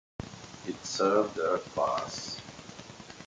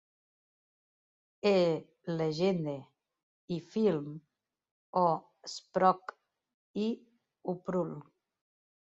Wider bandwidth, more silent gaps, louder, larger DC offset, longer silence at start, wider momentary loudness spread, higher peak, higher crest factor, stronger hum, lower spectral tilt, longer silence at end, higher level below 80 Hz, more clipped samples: first, 9.6 kHz vs 8 kHz; second, none vs 3.23-3.48 s, 4.71-4.93 s, 6.54-6.74 s; about the same, -31 LUFS vs -32 LUFS; neither; second, 0.2 s vs 1.45 s; first, 19 LU vs 16 LU; about the same, -12 dBFS vs -12 dBFS; about the same, 22 dB vs 24 dB; neither; second, -4 dB/octave vs -6.5 dB/octave; second, 0 s vs 1 s; first, -62 dBFS vs -76 dBFS; neither